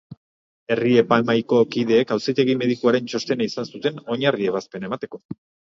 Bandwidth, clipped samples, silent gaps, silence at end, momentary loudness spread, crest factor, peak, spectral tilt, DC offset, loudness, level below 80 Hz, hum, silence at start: 7.6 kHz; under 0.1%; 0.17-0.67 s, 5.25-5.29 s; 0.35 s; 12 LU; 20 dB; -2 dBFS; -6 dB/octave; under 0.1%; -21 LUFS; -66 dBFS; none; 0.1 s